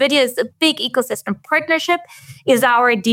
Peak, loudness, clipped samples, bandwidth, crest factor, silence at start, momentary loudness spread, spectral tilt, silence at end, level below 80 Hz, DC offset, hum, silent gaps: -4 dBFS; -17 LUFS; under 0.1%; 17 kHz; 14 dB; 0 s; 9 LU; -3 dB/octave; 0 s; -70 dBFS; under 0.1%; none; none